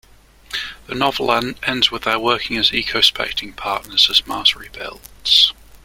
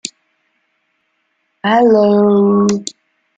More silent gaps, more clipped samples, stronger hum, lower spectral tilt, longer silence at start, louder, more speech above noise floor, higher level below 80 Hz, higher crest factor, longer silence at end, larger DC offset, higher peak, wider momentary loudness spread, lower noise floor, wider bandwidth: neither; neither; neither; second, -2 dB/octave vs -6 dB/octave; first, 0.5 s vs 0.05 s; second, -16 LUFS vs -12 LUFS; second, 27 dB vs 55 dB; first, -46 dBFS vs -60 dBFS; first, 20 dB vs 14 dB; second, 0.1 s vs 0.45 s; neither; about the same, 0 dBFS vs -2 dBFS; about the same, 15 LU vs 15 LU; second, -46 dBFS vs -66 dBFS; first, 16.5 kHz vs 9.2 kHz